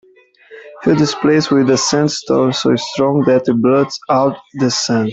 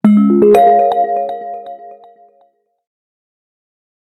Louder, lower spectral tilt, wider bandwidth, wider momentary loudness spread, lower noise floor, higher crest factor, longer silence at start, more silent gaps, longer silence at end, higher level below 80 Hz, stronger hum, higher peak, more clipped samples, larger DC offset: second, -14 LUFS vs -11 LUFS; second, -5 dB/octave vs -8.5 dB/octave; second, 8.2 kHz vs 13.5 kHz; second, 4 LU vs 21 LU; second, -47 dBFS vs -56 dBFS; about the same, 12 dB vs 14 dB; first, 0.5 s vs 0.05 s; neither; second, 0 s vs 2.2 s; first, -52 dBFS vs -58 dBFS; neither; about the same, -2 dBFS vs 0 dBFS; neither; neither